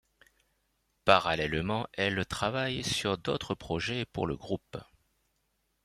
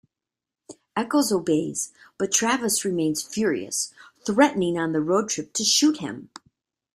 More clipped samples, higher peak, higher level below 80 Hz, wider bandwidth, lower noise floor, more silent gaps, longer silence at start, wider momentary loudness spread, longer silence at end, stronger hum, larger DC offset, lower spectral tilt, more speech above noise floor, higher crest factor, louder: neither; about the same, -6 dBFS vs -4 dBFS; first, -56 dBFS vs -66 dBFS; about the same, 16 kHz vs 15.5 kHz; second, -77 dBFS vs -88 dBFS; neither; first, 1.05 s vs 0.7 s; about the same, 12 LU vs 12 LU; first, 1 s vs 0.7 s; neither; neither; first, -4.5 dB/octave vs -3 dB/octave; second, 46 dB vs 65 dB; first, 26 dB vs 20 dB; second, -31 LUFS vs -23 LUFS